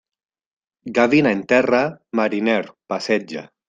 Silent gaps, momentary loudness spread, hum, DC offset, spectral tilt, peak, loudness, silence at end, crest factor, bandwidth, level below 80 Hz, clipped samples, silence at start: none; 12 LU; none; under 0.1%; -6 dB/octave; -2 dBFS; -19 LUFS; 0.25 s; 18 dB; 9 kHz; -62 dBFS; under 0.1%; 0.85 s